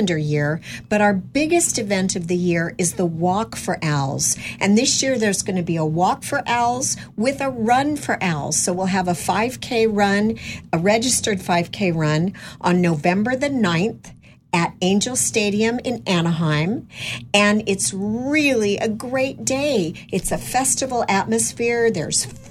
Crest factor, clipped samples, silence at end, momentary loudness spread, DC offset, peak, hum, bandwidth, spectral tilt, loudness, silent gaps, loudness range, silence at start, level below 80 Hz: 18 dB; under 0.1%; 0 s; 6 LU; under 0.1%; -2 dBFS; none; 16 kHz; -4 dB/octave; -20 LUFS; none; 1 LU; 0 s; -48 dBFS